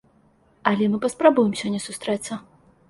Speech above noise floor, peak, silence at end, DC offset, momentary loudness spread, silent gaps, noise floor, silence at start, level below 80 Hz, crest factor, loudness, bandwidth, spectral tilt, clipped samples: 38 dB; -2 dBFS; 0.5 s; under 0.1%; 10 LU; none; -59 dBFS; 0.65 s; -64 dBFS; 22 dB; -22 LUFS; 11.5 kHz; -5 dB/octave; under 0.1%